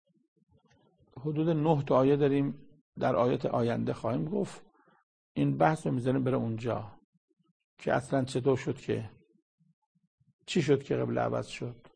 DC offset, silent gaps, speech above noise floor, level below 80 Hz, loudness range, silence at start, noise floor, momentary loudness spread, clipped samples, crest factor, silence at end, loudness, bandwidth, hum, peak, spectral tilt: under 0.1%; 2.81-2.93 s, 5.03-5.35 s, 7.04-7.28 s, 7.51-7.77 s, 9.42-9.58 s, 9.73-9.95 s, 10.07-10.18 s, 10.33-10.39 s; 38 dB; -64 dBFS; 5 LU; 1.15 s; -67 dBFS; 12 LU; under 0.1%; 22 dB; 0.2 s; -30 LUFS; 9.8 kHz; none; -10 dBFS; -7.5 dB/octave